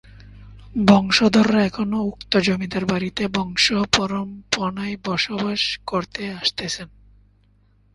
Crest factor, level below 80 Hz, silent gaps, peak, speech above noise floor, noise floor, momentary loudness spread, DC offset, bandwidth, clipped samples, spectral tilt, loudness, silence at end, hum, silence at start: 22 dB; -48 dBFS; none; 0 dBFS; 37 dB; -57 dBFS; 12 LU; under 0.1%; 11.5 kHz; under 0.1%; -4.5 dB/octave; -20 LUFS; 1.05 s; 50 Hz at -40 dBFS; 0.2 s